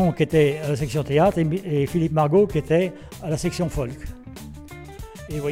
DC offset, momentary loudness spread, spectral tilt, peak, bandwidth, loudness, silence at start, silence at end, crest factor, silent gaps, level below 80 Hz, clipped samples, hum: under 0.1%; 20 LU; -7 dB/octave; -8 dBFS; 16 kHz; -22 LUFS; 0 s; 0 s; 16 dB; none; -40 dBFS; under 0.1%; none